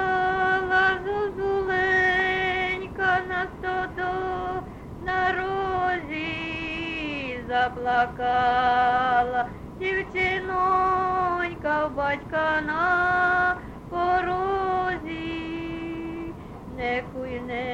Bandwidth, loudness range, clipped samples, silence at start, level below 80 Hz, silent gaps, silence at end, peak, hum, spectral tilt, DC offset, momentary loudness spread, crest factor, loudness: 8.6 kHz; 5 LU; under 0.1%; 0 s; -46 dBFS; none; 0 s; -10 dBFS; none; -6 dB/octave; under 0.1%; 11 LU; 16 dB; -25 LUFS